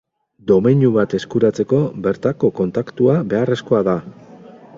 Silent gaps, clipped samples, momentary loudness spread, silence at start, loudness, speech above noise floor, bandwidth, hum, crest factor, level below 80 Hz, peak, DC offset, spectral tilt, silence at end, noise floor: none; under 0.1%; 7 LU; 0.45 s; -17 LUFS; 24 dB; 7.6 kHz; none; 16 dB; -52 dBFS; -2 dBFS; under 0.1%; -8.5 dB/octave; 0 s; -41 dBFS